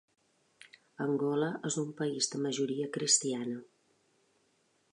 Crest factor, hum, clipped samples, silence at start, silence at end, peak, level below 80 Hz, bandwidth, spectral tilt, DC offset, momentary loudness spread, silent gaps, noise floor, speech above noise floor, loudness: 22 dB; none; under 0.1%; 1 s; 1.3 s; -14 dBFS; -88 dBFS; 11 kHz; -3 dB/octave; under 0.1%; 11 LU; none; -73 dBFS; 40 dB; -32 LUFS